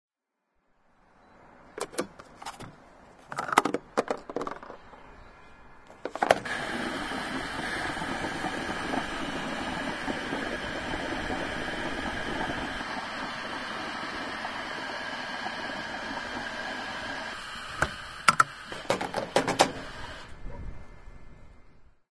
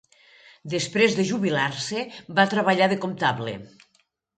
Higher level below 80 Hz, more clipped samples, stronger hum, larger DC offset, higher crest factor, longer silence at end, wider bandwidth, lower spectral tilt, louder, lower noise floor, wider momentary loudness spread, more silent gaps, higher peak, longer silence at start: first, -50 dBFS vs -66 dBFS; neither; neither; neither; first, 32 dB vs 20 dB; second, 0.25 s vs 0.7 s; first, 11 kHz vs 9.4 kHz; about the same, -3.5 dB/octave vs -4.5 dB/octave; second, -31 LUFS vs -23 LUFS; first, -80 dBFS vs -67 dBFS; first, 17 LU vs 11 LU; neither; about the same, -2 dBFS vs -4 dBFS; first, 1.3 s vs 0.65 s